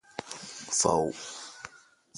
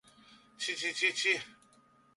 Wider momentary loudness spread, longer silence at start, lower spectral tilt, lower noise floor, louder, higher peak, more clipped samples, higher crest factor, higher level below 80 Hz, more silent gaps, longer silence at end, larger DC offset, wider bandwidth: first, 19 LU vs 10 LU; second, 0.15 s vs 0.3 s; first, -2.5 dB/octave vs 0 dB/octave; second, -56 dBFS vs -65 dBFS; about the same, -30 LUFS vs -31 LUFS; first, -8 dBFS vs -16 dBFS; neither; about the same, 24 dB vs 20 dB; first, -62 dBFS vs -82 dBFS; neither; second, 0 s vs 0.65 s; neither; about the same, 11.5 kHz vs 11.5 kHz